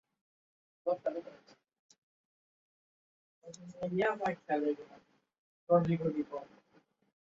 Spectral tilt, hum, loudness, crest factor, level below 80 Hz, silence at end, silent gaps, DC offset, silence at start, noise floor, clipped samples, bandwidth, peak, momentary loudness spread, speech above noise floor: -6.5 dB/octave; none; -35 LUFS; 24 dB; -74 dBFS; 0.85 s; 1.79-1.89 s, 1.98-3.42 s, 5.38-5.67 s; under 0.1%; 0.85 s; -70 dBFS; under 0.1%; 7.6 kHz; -14 dBFS; 22 LU; 36 dB